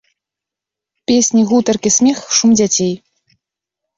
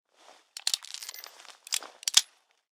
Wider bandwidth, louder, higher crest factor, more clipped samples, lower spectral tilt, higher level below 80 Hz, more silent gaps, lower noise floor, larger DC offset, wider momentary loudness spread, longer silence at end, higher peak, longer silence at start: second, 7.8 kHz vs 19 kHz; first, -13 LUFS vs -28 LUFS; second, 14 dB vs 34 dB; neither; first, -3.5 dB/octave vs 4.5 dB/octave; first, -54 dBFS vs -78 dBFS; neither; first, -85 dBFS vs -59 dBFS; neither; second, 8 LU vs 23 LU; first, 1 s vs 0.5 s; about the same, -2 dBFS vs 0 dBFS; first, 1.1 s vs 0.65 s